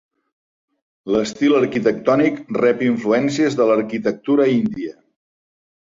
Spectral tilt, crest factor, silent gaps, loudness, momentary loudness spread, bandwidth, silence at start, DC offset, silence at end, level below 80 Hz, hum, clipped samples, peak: -6 dB/octave; 16 dB; none; -18 LUFS; 7 LU; 7.8 kHz; 1.05 s; under 0.1%; 1 s; -58 dBFS; none; under 0.1%; -2 dBFS